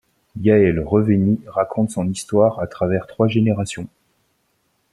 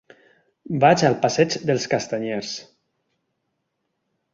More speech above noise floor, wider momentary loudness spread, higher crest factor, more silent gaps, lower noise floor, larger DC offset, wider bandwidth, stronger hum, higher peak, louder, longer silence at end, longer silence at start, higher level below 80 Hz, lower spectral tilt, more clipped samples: second, 49 dB vs 55 dB; second, 9 LU vs 14 LU; about the same, 18 dB vs 22 dB; neither; second, -66 dBFS vs -76 dBFS; neither; first, 12 kHz vs 7.8 kHz; neither; about the same, -2 dBFS vs -2 dBFS; about the same, -19 LUFS vs -21 LUFS; second, 1.05 s vs 1.7 s; second, 0.35 s vs 0.7 s; first, -48 dBFS vs -62 dBFS; first, -7 dB/octave vs -5 dB/octave; neither